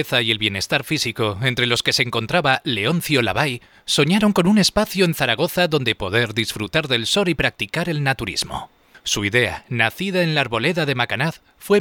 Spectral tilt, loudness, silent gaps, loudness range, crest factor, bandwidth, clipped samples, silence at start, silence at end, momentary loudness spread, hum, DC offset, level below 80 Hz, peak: -4 dB/octave; -19 LUFS; none; 3 LU; 18 dB; 19 kHz; under 0.1%; 0 s; 0 s; 7 LU; none; under 0.1%; -46 dBFS; -2 dBFS